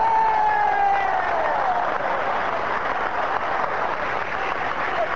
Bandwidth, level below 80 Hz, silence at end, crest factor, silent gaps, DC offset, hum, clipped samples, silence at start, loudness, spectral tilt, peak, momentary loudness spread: 7.8 kHz; -50 dBFS; 0 s; 14 dB; none; 2%; none; under 0.1%; 0 s; -22 LUFS; -4.5 dB/octave; -8 dBFS; 5 LU